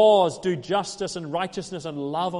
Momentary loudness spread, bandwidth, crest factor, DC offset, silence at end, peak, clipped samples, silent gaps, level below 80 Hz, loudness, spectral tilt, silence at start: 11 LU; 11.5 kHz; 16 dB; under 0.1%; 0 s; -8 dBFS; under 0.1%; none; -60 dBFS; -26 LUFS; -5 dB/octave; 0 s